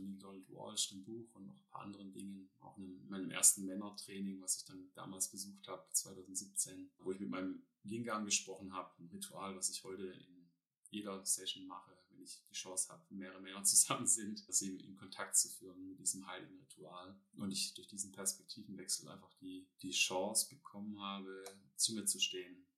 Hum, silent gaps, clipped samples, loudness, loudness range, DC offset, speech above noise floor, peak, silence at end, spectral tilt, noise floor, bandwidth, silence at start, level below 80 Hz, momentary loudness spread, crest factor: none; 10.78-10.83 s; under 0.1%; -38 LUFS; 9 LU; under 0.1%; 28 dB; -14 dBFS; 0.15 s; -1 dB/octave; -70 dBFS; 15.5 kHz; 0 s; under -90 dBFS; 20 LU; 28 dB